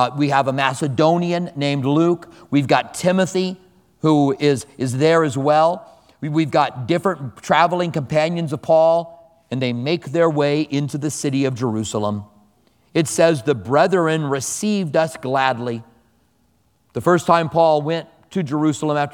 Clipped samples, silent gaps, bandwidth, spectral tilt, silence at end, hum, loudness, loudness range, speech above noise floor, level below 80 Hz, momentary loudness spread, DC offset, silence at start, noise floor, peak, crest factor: under 0.1%; none; 18 kHz; -5.5 dB/octave; 0 s; none; -19 LUFS; 3 LU; 43 dB; -60 dBFS; 9 LU; under 0.1%; 0 s; -62 dBFS; 0 dBFS; 18 dB